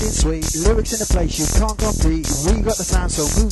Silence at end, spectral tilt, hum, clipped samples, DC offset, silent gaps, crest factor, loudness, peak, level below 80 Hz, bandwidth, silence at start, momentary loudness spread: 0 s; -4.5 dB/octave; none; under 0.1%; under 0.1%; none; 16 dB; -19 LUFS; -2 dBFS; -20 dBFS; 13 kHz; 0 s; 2 LU